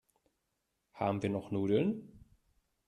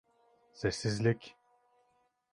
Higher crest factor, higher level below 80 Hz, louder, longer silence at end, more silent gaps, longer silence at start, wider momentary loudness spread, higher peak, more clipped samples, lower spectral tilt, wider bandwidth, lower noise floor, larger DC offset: about the same, 20 dB vs 22 dB; second, -70 dBFS vs -60 dBFS; about the same, -34 LUFS vs -34 LUFS; second, 0.7 s vs 1 s; neither; first, 0.95 s vs 0.55 s; second, 6 LU vs 10 LU; about the same, -18 dBFS vs -16 dBFS; neither; first, -8 dB/octave vs -5.5 dB/octave; about the same, 11 kHz vs 11 kHz; first, -83 dBFS vs -74 dBFS; neither